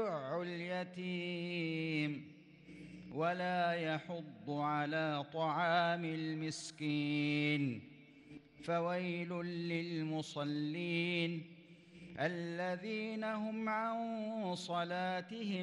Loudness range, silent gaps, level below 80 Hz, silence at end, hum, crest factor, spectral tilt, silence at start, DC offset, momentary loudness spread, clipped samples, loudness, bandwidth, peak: 4 LU; none; -82 dBFS; 0 s; none; 16 dB; -6 dB/octave; 0 s; under 0.1%; 12 LU; under 0.1%; -38 LUFS; 10.5 kHz; -22 dBFS